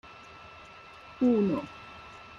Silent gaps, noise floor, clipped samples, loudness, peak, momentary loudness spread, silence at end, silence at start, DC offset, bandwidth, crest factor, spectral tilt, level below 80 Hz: none; -50 dBFS; under 0.1%; -28 LUFS; -16 dBFS; 23 LU; 0 s; 0.05 s; under 0.1%; 7.2 kHz; 16 dB; -8 dB/octave; -64 dBFS